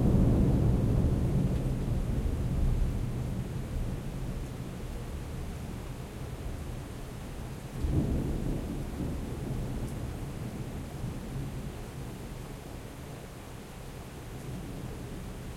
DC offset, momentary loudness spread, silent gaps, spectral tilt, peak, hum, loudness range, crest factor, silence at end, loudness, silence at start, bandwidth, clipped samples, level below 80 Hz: under 0.1%; 15 LU; none; -7.5 dB/octave; -14 dBFS; none; 11 LU; 18 dB; 0 s; -34 LUFS; 0 s; 16 kHz; under 0.1%; -36 dBFS